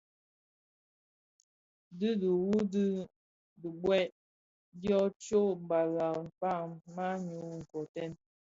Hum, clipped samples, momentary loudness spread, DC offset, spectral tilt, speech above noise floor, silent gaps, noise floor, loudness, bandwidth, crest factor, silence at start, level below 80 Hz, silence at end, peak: none; under 0.1%; 12 LU; under 0.1%; -7 dB/octave; over 57 dB; 3.16-3.56 s, 4.12-4.72 s, 5.16-5.20 s, 7.89-7.94 s; under -90 dBFS; -34 LUFS; 7.8 kHz; 18 dB; 1.9 s; -70 dBFS; 0.4 s; -18 dBFS